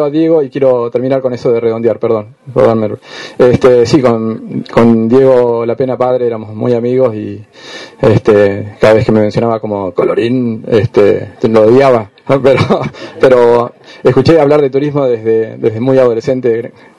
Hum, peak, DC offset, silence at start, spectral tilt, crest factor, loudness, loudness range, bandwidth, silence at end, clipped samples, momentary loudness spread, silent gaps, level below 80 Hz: none; 0 dBFS; under 0.1%; 0 s; -7.5 dB/octave; 10 dB; -10 LUFS; 3 LU; 11 kHz; 0.3 s; 0.4%; 10 LU; none; -42 dBFS